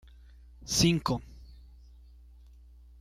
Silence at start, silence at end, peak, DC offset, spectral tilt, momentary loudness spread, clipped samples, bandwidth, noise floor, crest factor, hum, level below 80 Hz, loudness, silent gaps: 0.6 s; 1.4 s; -12 dBFS; under 0.1%; -4 dB/octave; 25 LU; under 0.1%; 16 kHz; -53 dBFS; 22 dB; 60 Hz at -50 dBFS; -48 dBFS; -28 LUFS; none